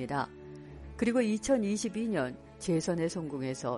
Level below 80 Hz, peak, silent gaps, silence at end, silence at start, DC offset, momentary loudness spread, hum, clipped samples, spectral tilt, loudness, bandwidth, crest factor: -56 dBFS; -16 dBFS; none; 0 s; 0 s; under 0.1%; 16 LU; none; under 0.1%; -5.5 dB/octave; -32 LUFS; 11.5 kHz; 16 dB